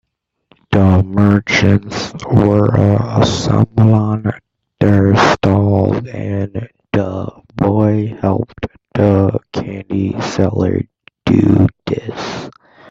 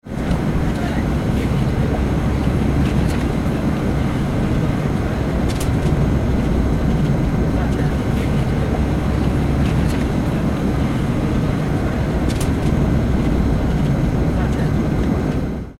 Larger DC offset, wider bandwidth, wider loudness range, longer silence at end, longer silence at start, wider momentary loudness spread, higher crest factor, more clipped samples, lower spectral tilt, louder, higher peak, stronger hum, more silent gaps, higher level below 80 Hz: second, under 0.1% vs 0.1%; second, 7.8 kHz vs 14 kHz; first, 4 LU vs 1 LU; first, 0.4 s vs 0.05 s; first, 0.7 s vs 0.05 s; first, 12 LU vs 2 LU; about the same, 14 dB vs 12 dB; neither; about the same, -7 dB/octave vs -7.5 dB/octave; first, -14 LUFS vs -19 LUFS; first, 0 dBFS vs -6 dBFS; neither; neither; second, -42 dBFS vs -24 dBFS